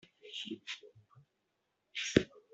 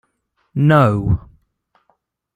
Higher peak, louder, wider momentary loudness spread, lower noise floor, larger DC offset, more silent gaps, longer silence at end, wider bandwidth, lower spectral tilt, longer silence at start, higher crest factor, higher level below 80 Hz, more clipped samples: second, -8 dBFS vs -2 dBFS; second, -37 LUFS vs -16 LUFS; first, 14 LU vs 11 LU; first, -82 dBFS vs -67 dBFS; neither; neither; second, 0.15 s vs 1.15 s; second, 8.2 kHz vs 9.2 kHz; second, -4.5 dB/octave vs -9 dB/octave; second, 0.25 s vs 0.55 s; first, 32 dB vs 18 dB; second, -64 dBFS vs -38 dBFS; neither